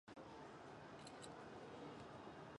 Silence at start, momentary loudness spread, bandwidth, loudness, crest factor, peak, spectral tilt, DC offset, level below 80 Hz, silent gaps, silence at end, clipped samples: 0.05 s; 2 LU; 11 kHz; -57 LUFS; 14 dB; -42 dBFS; -5 dB/octave; under 0.1%; -78 dBFS; none; 0 s; under 0.1%